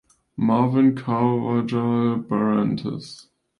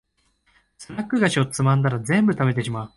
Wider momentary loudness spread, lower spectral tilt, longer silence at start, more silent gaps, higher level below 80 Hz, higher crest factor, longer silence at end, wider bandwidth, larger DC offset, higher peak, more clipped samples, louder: first, 12 LU vs 7 LU; first, -8.5 dB/octave vs -6 dB/octave; second, 0.4 s vs 0.8 s; neither; about the same, -60 dBFS vs -56 dBFS; about the same, 14 dB vs 16 dB; first, 0.4 s vs 0.1 s; about the same, 10.5 kHz vs 11.5 kHz; neither; about the same, -6 dBFS vs -6 dBFS; neither; about the same, -21 LUFS vs -21 LUFS